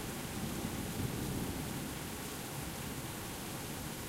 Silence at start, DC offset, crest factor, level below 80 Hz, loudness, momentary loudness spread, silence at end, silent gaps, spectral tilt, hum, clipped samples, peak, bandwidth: 0 s; under 0.1%; 16 dB; -52 dBFS; -40 LUFS; 3 LU; 0 s; none; -4 dB/octave; none; under 0.1%; -24 dBFS; 16 kHz